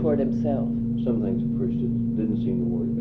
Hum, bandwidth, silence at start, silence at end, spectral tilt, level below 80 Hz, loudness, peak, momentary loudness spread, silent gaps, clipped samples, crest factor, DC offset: none; 3.9 kHz; 0 s; 0 s; -11.5 dB/octave; -42 dBFS; -25 LUFS; -12 dBFS; 2 LU; none; under 0.1%; 12 dB; under 0.1%